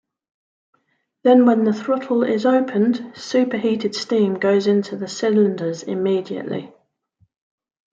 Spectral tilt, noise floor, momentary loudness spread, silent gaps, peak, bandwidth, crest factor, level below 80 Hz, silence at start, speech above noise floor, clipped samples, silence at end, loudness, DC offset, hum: -6 dB/octave; -67 dBFS; 11 LU; none; -4 dBFS; 7.6 kHz; 16 dB; -70 dBFS; 1.25 s; 49 dB; under 0.1%; 1.25 s; -19 LUFS; under 0.1%; none